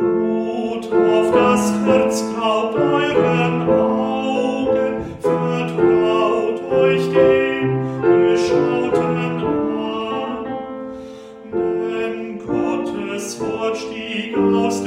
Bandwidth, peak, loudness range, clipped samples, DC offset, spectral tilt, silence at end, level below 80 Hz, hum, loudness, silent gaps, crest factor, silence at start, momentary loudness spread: 14 kHz; -2 dBFS; 7 LU; under 0.1%; under 0.1%; -6 dB/octave; 0 s; -52 dBFS; none; -18 LUFS; none; 16 dB; 0 s; 10 LU